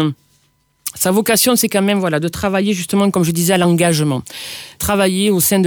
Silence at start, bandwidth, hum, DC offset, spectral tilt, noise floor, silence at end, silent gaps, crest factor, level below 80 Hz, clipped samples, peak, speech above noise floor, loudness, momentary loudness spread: 0 s; over 20 kHz; none; under 0.1%; -4.5 dB/octave; -59 dBFS; 0 s; none; 14 dB; -46 dBFS; under 0.1%; -2 dBFS; 44 dB; -15 LUFS; 15 LU